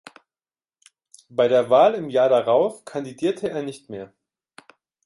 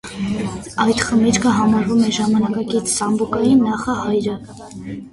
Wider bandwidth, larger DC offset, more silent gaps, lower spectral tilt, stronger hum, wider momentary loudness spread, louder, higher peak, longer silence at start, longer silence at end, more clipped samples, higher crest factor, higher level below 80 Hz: about the same, 11.5 kHz vs 11.5 kHz; neither; neither; about the same, -5.5 dB/octave vs -4.5 dB/octave; neither; first, 17 LU vs 12 LU; second, -20 LUFS vs -17 LUFS; about the same, -4 dBFS vs -2 dBFS; first, 1.35 s vs 0.05 s; first, 1 s vs 0.05 s; neither; about the same, 18 dB vs 14 dB; second, -70 dBFS vs -46 dBFS